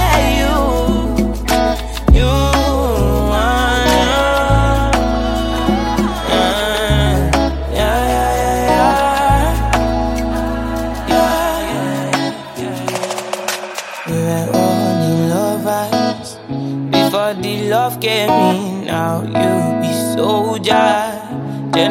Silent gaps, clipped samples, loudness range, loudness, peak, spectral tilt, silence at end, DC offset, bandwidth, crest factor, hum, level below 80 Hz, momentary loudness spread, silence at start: none; under 0.1%; 4 LU; -15 LUFS; 0 dBFS; -5 dB/octave; 0 s; under 0.1%; 17 kHz; 14 dB; none; -22 dBFS; 8 LU; 0 s